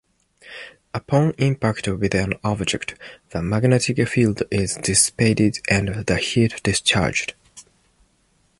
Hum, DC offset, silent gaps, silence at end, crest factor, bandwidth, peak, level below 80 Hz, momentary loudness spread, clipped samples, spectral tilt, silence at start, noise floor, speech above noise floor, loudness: none; under 0.1%; none; 1 s; 20 dB; 11.5 kHz; -2 dBFS; -42 dBFS; 15 LU; under 0.1%; -4.5 dB/octave; 0.45 s; -63 dBFS; 42 dB; -20 LUFS